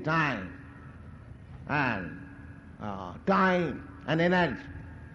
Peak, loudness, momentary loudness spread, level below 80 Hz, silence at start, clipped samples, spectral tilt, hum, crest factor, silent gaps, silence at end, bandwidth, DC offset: -14 dBFS; -29 LUFS; 23 LU; -54 dBFS; 0 s; under 0.1%; -7 dB/octave; none; 16 dB; none; 0 s; 7.6 kHz; under 0.1%